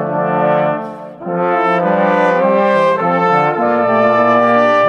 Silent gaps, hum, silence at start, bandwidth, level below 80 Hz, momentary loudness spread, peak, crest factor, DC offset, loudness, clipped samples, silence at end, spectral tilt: none; none; 0 s; 8.4 kHz; -62 dBFS; 7 LU; 0 dBFS; 12 dB; under 0.1%; -13 LUFS; under 0.1%; 0 s; -7.5 dB/octave